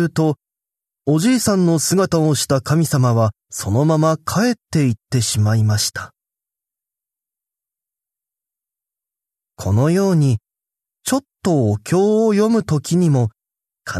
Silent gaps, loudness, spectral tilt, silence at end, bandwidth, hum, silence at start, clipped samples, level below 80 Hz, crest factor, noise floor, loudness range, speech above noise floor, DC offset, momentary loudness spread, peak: none; -17 LUFS; -6 dB/octave; 0 s; 13.5 kHz; none; 0 s; under 0.1%; -54 dBFS; 16 dB; -88 dBFS; 7 LU; 72 dB; under 0.1%; 8 LU; -4 dBFS